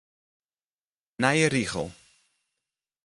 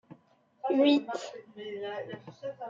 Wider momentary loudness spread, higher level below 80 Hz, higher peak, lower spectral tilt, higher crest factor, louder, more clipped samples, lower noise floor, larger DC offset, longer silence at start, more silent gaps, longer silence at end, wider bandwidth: second, 13 LU vs 19 LU; first, -58 dBFS vs -82 dBFS; first, -6 dBFS vs -14 dBFS; about the same, -4.5 dB/octave vs -5 dB/octave; first, 24 dB vs 18 dB; first, -25 LUFS vs -30 LUFS; neither; first, under -90 dBFS vs -64 dBFS; neither; first, 1.2 s vs 0.1 s; neither; first, 1.15 s vs 0 s; first, 11.5 kHz vs 7.6 kHz